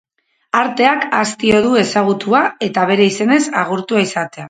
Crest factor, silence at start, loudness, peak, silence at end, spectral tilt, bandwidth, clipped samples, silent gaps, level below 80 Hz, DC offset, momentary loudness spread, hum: 14 dB; 0.55 s; -14 LUFS; 0 dBFS; 0 s; -4.5 dB/octave; 9.4 kHz; under 0.1%; none; -54 dBFS; under 0.1%; 5 LU; none